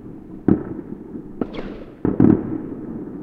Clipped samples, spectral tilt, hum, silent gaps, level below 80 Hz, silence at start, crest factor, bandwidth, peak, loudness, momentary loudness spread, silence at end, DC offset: under 0.1%; -11 dB/octave; none; none; -42 dBFS; 0 s; 22 dB; 4.9 kHz; 0 dBFS; -22 LUFS; 18 LU; 0 s; under 0.1%